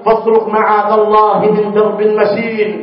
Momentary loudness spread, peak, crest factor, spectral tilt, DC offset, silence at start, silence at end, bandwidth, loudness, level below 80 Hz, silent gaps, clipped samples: 4 LU; 0 dBFS; 10 dB; -11 dB/octave; under 0.1%; 0 s; 0 s; 5.6 kHz; -11 LUFS; -52 dBFS; none; under 0.1%